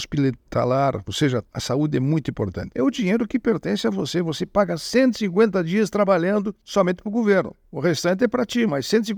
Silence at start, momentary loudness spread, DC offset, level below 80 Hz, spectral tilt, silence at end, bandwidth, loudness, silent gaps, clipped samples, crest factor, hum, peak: 0 s; 5 LU; under 0.1%; -52 dBFS; -6 dB/octave; 0 s; over 20 kHz; -22 LUFS; none; under 0.1%; 16 dB; none; -4 dBFS